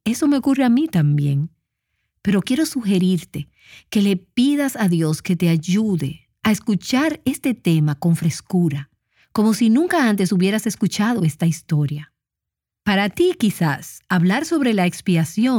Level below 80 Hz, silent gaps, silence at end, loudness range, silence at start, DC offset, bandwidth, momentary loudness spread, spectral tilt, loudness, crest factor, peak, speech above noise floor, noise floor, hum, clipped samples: -56 dBFS; none; 0 s; 2 LU; 0.05 s; under 0.1%; 18 kHz; 7 LU; -6 dB/octave; -19 LUFS; 16 dB; -4 dBFS; 67 dB; -85 dBFS; none; under 0.1%